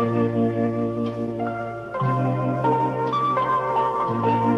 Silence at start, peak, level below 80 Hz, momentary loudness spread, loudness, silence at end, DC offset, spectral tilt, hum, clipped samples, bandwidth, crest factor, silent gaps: 0 s; -10 dBFS; -56 dBFS; 6 LU; -23 LUFS; 0 s; under 0.1%; -9 dB/octave; none; under 0.1%; 7.6 kHz; 12 dB; none